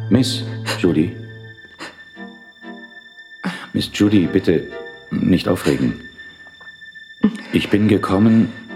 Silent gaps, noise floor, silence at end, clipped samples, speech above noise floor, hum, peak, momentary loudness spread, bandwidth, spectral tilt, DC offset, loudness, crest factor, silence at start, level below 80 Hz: none; -41 dBFS; 0 s; under 0.1%; 24 dB; none; -2 dBFS; 23 LU; 15 kHz; -6.5 dB/octave; under 0.1%; -18 LUFS; 18 dB; 0 s; -48 dBFS